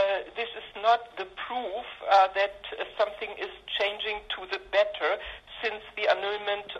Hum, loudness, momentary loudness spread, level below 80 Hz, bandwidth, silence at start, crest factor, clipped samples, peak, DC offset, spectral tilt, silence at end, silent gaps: none; -29 LUFS; 12 LU; -60 dBFS; 8 kHz; 0 s; 20 dB; under 0.1%; -10 dBFS; under 0.1%; -2.5 dB/octave; 0 s; none